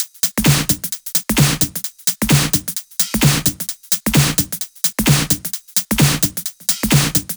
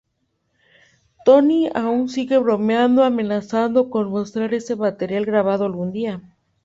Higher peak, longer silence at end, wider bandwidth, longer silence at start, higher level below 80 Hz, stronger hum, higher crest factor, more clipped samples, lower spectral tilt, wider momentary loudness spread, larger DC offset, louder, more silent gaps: about the same, 0 dBFS vs -2 dBFS; second, 0 s vs 0.45 s; first, over 20 kHz vs 7.8 kHz; second, 0 s vs 1.25 s; first, -36 dBFS vs -62 dBFS; neither; about the same, 18 dB vs 18 dB; neither; second, -3.5 dB/octave vs -7 dB/octave; second, 5 LU vs 9 LU; neither; first, -16 LUFS vs -19 LUFS; neither